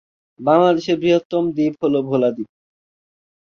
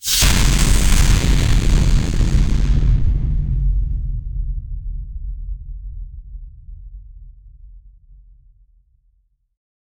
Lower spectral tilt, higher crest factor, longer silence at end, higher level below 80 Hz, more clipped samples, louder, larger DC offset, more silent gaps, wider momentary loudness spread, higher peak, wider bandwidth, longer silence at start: first, -7 dB/octave vs -4 dB/octave; about the same, 16 dB vs 14 dB; second, 0.95 s vs 2.2 s; second, -60 dBFS vs -18 dBFS; neither; about the same, -18 LUFS vs -18 LUFS; neither; first, 1.25-1.30 s vs none; second, 9 LU vs 22 LU; about the same, -2 dBFS vs -2 dBFS; second, 7 kHz vs over 20 kHz; first, 0.4 s vs 0.05 s